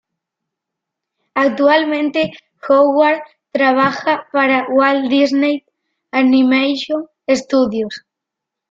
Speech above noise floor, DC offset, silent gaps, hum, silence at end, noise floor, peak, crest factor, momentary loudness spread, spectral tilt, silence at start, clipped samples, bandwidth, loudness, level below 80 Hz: 67 dB; under 0.1%; none; none; 0.75 s; -82 dBFS; -2 dBFS; 14 dB; 10 LU; -4.5 dB/octave; 1.35 s; under 0.1%; 7.8 kHz; -15 LUFS; -60 dBFS